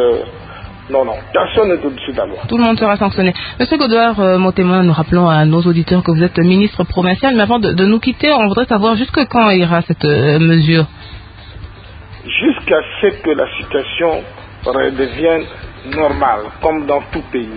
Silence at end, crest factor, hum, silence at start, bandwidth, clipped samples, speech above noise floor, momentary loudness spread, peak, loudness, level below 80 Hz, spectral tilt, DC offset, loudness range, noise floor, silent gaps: 0 s; 14 dB; none; 0 s; 5 kHz; under 0.1%; 21 dB; 12 LU; 0 dBFS; -13 LUFS; -36 dBFS; -11 dB/octave; under 0.1%; 5 LU; -33 dBFS; none